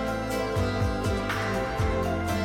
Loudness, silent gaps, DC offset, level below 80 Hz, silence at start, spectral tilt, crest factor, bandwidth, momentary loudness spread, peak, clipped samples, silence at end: -28 LUFS; none; under 0.1%; -36 dBFS; 0 s; -6 dB/octave; 12 dB; 17 kHz; 1 LU; -16 dBFS; under 0.1%; 0 s